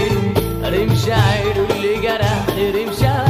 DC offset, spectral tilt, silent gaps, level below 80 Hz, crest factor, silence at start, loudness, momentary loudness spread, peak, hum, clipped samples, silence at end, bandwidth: under 0.1%; -6 dB/octave; none; -32 dBFS; 14 dB; 0 s; -17 LUFS; 4 LU; -2 dBFS; none; under 0.1%; 0 s; 15.5 kHz